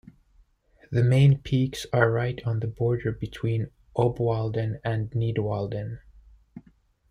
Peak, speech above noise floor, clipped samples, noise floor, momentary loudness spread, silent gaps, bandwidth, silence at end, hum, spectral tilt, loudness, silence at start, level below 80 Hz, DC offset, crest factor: -6 dBFS; 37 dB; under 0.1%; -61 dBFS; 11 LU; none; 11.5 kHz; 0.5 s; none; -7.5 dB/octave; -26 LUFS; 0.9 s; -50 dBFS; under 0.1%; 20 dB